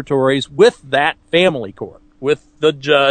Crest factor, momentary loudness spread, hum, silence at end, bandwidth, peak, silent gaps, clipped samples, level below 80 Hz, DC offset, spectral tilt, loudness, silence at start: 16 dB; 14 LU; none; 0 s; 9.4 kHz; 0 dBFS; none; under 0.1%; -52 dBFS; under 0.1%; -5 dB/octave; -16 LUFS; 0 s